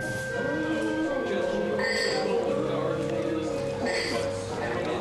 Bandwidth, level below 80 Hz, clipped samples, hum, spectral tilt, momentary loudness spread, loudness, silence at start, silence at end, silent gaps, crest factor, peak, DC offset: 12.5 kHz; -52 dBFS; under 0.1%; none; -5 dB/octave; 4 LU; -28 LUFS; 0 s; 0 s; none; 14 dB; -14 dBFS; under 0.1%